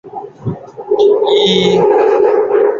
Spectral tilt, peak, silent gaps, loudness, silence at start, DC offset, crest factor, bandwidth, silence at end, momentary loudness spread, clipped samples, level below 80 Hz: -5.5 dB/octave; 0 dBFS; none; -11 LUFS; 0.05 s; under 0.1%; 10 dB; 7.4 kHz; 0 s; 14 LU; under 0.1%; -50 dBFS